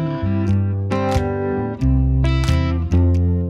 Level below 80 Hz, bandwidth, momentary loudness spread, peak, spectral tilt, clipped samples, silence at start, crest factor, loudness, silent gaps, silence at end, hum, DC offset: -24 dBFS; 9.4 kHz; 4 LU; -6 dBFS; -8 dB/octave; under 0.1%; 0 s; 12 dB; -19 LUFS; none; 0 s; none; under 0.1%